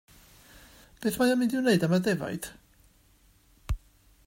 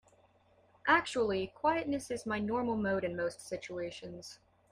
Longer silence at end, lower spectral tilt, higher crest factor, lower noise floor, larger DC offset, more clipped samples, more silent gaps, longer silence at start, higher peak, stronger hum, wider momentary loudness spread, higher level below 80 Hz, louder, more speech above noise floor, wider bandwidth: first, 0.5 s vs 0.35 s; about the same, -5.5 dB/octave vs -4.5 dB/octave; about the same, 18 dB vs 20 dB; second, -62 dBFS vs -67 dBFS; neither; neither; neither; first, 1 s vs 0.85 s; about the same, -12 dBFS vs -14 dBFS; neither; about the same, 14 LU vs 14 LU; first, -46 dBFS vs -66 dBFS; first, -28 LUFS vs -34 LUFS; about the same, 36 dB vs 33 dB; first, 16 kHz vs 14.5 kHz